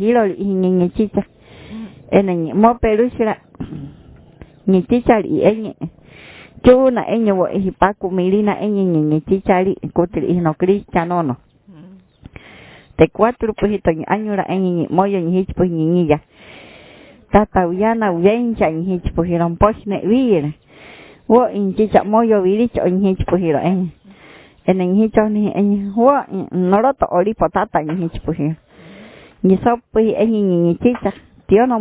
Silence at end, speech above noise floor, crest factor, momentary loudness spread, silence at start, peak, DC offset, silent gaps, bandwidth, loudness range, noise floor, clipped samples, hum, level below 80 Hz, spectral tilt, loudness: 0 s; 29 dB; 16 dB; 9 LU; 0 s; 0 dBFS; under 0.1%; none; 4 kHz; 3 LU; -44 dBFS; under 0.1%; none; -38 dBFS; -12 dB/octave; -16 LUFS